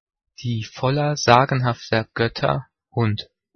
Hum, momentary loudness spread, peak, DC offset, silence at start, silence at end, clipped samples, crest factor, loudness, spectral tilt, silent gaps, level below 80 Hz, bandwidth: none; 12 LU; 0 dBFS; under 0.1%; 0.4 s; 0.35 s; under 0.1%; 22 dB; -21 LUFS; -5.5 dB/octave; none; -54 dBFS; 6.6 kHz